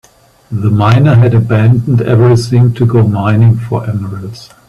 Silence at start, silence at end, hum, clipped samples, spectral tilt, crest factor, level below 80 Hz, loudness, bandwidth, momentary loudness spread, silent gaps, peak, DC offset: 0.5 s; 0.25 s; none; under 0.1%; -8.5 dB/octave; 10 dB; -40 dBFS; -10 LUFS; 11 kHz; 12 LU; none; 0 dBFS; under 0.1%